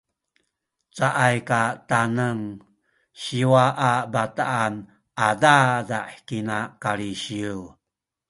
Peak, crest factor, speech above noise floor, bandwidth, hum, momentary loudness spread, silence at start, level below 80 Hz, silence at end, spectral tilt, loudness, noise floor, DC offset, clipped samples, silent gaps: -2 dBFS; 22 dB; 63 dB; 11.5 kHz; none; 14 LU; 0.95 s; -60 dBFS; 0.6 s; -5 dB/octave; -22 LUFS; -85 dBFS; under 0.1%; under 0.1%; none